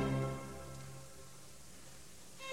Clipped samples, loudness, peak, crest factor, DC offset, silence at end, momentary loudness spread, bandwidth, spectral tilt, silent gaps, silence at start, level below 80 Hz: under 0.1%; -46 LUFS; -26 dBFS; 18 dB; 0.2%; 0 s; 16 LU; 16 kHz; -5.5 dB/octave; none; 0 s; -60 dBFS